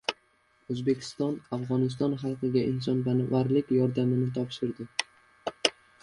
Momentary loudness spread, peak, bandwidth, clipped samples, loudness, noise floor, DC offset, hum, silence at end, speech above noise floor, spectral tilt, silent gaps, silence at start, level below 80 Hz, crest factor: 9 LU; -6 dBFS; 11 kHz; under 0.1%; -29 LUFS; -67 dBFS; under 0.1%; none; 0.3 s; 39 dB; -6 dB/octave; none; 0.1 s; -64 dBFS; 22 dB